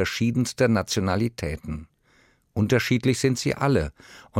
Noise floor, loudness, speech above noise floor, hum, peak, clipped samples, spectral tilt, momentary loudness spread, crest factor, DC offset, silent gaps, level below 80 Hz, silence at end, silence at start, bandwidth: -61 dBFS; -24 LUFS; 37 dB; none; -8 dBFS; under 0.1%; -5.5 dB/octave; 13 LU; 16 dB; under 0.1%; none; -46 dBFS; 0 s; 0 s; 16 kHz